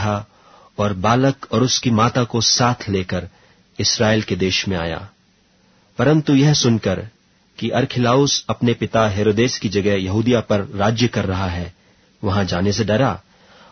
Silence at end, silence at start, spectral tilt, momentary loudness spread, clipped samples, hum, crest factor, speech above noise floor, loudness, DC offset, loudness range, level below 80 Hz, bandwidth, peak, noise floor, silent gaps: 0.5 s; 0 s; -5 dB/octave; 12 LU; under 0.1%; none; 18 dB; 39 dB; -18 LUFS; under 0.1%; 3 LU; -46 dBFS; 6.6 kHz; -2 dBFS; -57 dBFS; none